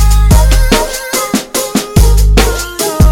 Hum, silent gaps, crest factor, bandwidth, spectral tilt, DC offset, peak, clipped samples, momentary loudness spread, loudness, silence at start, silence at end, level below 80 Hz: none; none; 8 dB; 17 kHz; -4.5 dB/octave; under 0.1%; 0 dBFS; 0.2%; 6 LU; -11 LUFS; 0 s; 0 s; -10 dBFS